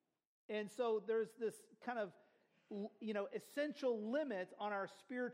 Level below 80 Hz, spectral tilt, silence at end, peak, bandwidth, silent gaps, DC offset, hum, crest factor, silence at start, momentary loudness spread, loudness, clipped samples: under -90 dBFS; -5.5 dB/octave; 0 s; -28 dBFS; 16 kHz; none; under 0.1%; none; 16 dB; 0.5 s; 9 LU; -44 LUFS; under 0.1%